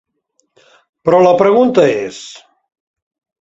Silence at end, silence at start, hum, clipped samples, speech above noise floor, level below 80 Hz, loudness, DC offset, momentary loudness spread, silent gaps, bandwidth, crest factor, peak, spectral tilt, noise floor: 1.05 s; 1.05 s; none; under 0.1%; 53 dB; -56 dBFS; -11 LUFS; under 0.1%; 19 LU; none; 8 kHz; 14 dB; 0 dBFS; -6 dB/octave; -64 dBFS